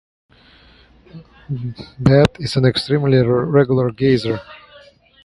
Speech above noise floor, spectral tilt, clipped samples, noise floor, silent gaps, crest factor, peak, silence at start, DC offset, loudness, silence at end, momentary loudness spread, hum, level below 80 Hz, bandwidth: 33 dB; -7.5 dB/octave; under 0.1%; -49 dBFS; none; 18 dB; 0 dBFS; 1.15 s; under 0.1%; -16 LUFS; 0.7 s; 13 LU; none; -44 dBFS; 11.5 kHz